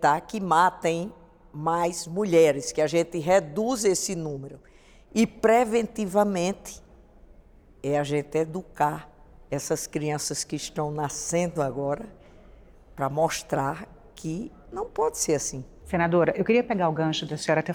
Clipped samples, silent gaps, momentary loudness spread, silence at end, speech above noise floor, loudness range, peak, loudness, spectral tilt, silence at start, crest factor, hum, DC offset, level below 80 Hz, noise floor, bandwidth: under 0.1%; none; 14 LU; 0 s; 28 dB; 6 LU; -8 dBFS; -26 LUFS; -4.5 dB/octave; 0 s; 18 dB; none; under 0.1%; -54 dBFS; -53 dBFS; over 20 kHz